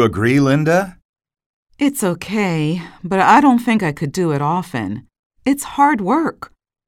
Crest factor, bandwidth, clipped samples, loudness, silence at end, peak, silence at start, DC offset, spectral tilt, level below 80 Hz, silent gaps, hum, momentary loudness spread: 16 dB; 16.5 kHz; under 0.1%; -17 LUFS; 0.45 s; 0 dBFS; 0 s; under 0.1%; -6 dB/octave; -50 dBFS; 1.05-1.13 s, 1.46-1.66 s, 5.19-5.30 s; none; 13 LU